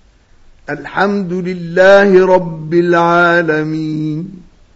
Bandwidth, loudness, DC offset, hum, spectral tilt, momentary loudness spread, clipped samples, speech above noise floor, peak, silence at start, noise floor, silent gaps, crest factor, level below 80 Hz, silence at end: 8 kHz; -12 LUFS; under 0.1%; none; -7 dB/octave; 14 LU; 0.2%; 33 dB; 0 dBFS; 0.7 s; -45 dBFS; none; 12 dB; -46 dBFS; 0.4 s